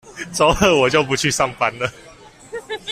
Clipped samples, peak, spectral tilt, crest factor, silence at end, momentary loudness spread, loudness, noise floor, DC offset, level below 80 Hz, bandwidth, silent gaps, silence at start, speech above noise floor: under 0.1%; -2 dBFS; -3.5 dB/octave; 18 dB; 0 s; 15 LU; -17 LUFS; -39 dBFS; under 0.1%; -40 dBFS; 16 kHz; none; 0.05 s; 22 dB